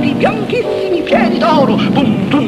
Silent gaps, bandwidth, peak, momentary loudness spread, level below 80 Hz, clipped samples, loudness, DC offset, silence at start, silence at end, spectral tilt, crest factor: none; 13 kHz; 0 dBFS; 5 LU; -42 dBFS; under 0.1%; -12 LUFS; under 0.1%; 0 s; 0 s; -7 dB/octave; 12 dB